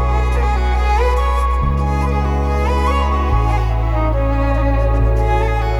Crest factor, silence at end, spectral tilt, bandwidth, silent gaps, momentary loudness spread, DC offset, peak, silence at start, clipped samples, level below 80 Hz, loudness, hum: 12 dB; 0 s; -7.5 dB/octave; 10.5 kHz; none; 2 LU; under 0.1%; -4 dBFS; 0 s; under 0.1%; -16 dBFS; -17 LUFS; none